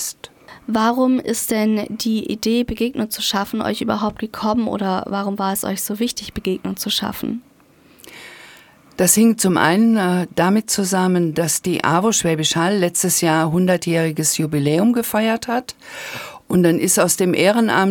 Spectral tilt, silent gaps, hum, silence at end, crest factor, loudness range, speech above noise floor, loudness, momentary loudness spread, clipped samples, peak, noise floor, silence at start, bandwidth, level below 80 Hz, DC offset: -4 dB/octave; none; none; 0 s; 18 dB; 6 LU; 33 dB; -18 LUFS; 11 LU; under 0.1%; 0 dBFS; -51 dBFS; 0 s; 18 kHz; -50 dBFS; under 0.1%